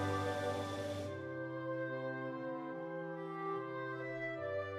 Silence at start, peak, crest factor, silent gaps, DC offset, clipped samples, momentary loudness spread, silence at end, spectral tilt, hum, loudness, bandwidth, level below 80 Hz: 0 s; -26 dBFS; 14 dB; none; under 0.1%; under 0.1%; 6 LU; 0 s; -6 dB/octave; none; -41 LUFS; 15 kHz; -76 dBFS